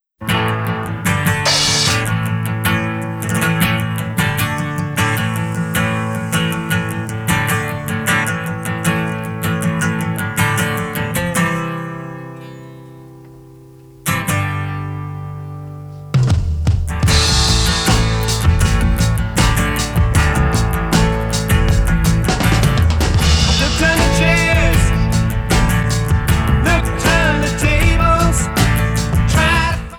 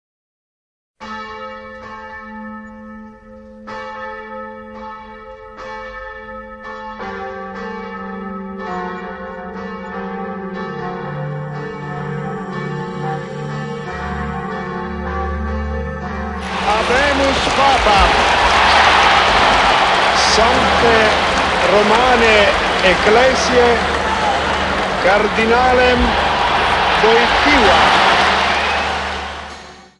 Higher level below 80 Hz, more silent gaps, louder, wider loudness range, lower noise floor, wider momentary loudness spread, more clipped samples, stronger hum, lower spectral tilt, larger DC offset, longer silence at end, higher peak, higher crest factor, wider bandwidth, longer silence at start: first, -22 dBFS vs -32 dBFS; neither; about the same, -16 LUFS vs -14 LUFS; second, 8 LU vs 20 LU; about the same, -40 dBFS vs -38 dBFS; second, 9 LU vs 20 LU; neither; neither; about the same, -4.5 dB/octave vs -3.5 dB/octave; neither; second, 0 s vs 0.2 s; about the same, 0 dBFS vs 0 dBFS; about the same, 14 dB vs 16 dB; first, over 20 kHz vs 11.5 kHz; second, 0.2 s vs 1 s